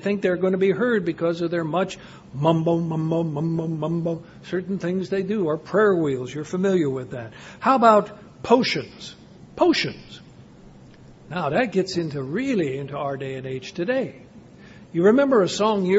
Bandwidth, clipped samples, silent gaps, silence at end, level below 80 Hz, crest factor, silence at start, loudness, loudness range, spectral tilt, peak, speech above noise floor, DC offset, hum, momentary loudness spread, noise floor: 8 kHz; under 0.1%; none; 0 s; -58 dBFS; 22 dB; 0 s; -22 LUFS; 5 LU; -6.5 dB/octave; -2 dBFS; 24 dB; under 0.1%; none; 15 LU; -46 dBFS